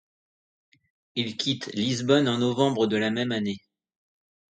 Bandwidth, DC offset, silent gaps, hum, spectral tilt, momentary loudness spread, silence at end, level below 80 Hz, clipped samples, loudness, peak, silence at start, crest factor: 9.4 kHz; under 0.1%; none; none; -5 dB/octave; 9 LU; 1 s; -68 dBFS; under 0.1%; -25 LUFS; -8 dBFS; 1.15 s; 20 dB